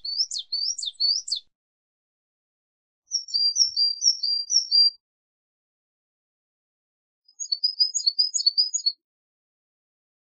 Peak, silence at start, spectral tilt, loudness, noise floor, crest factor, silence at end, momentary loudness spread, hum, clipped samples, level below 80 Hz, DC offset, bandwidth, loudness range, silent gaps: -8 dBFS; 0.05 s; 6.5 dB/octave; -21 LUFS; under -90 dBFS; 20 dB; 1.4 s; 10 LU; none; under 0.1%; -84 dBFS; under 0.1%; 9.6 kHz; 6 LU; 1.55-3.02 s, 5.00-7.22 s